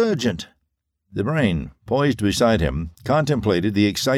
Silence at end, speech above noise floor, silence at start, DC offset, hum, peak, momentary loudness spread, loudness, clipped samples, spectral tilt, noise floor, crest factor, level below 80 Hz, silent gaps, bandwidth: 0 s; 55 dB; 0 s; under 0.1%; none; -6 dBFS; 10 LU; -21 LUFS; under 0.1%; -5.5 dB/octave; -75 dBFS; 16 dB; -38 dBFS; none; 16 kHz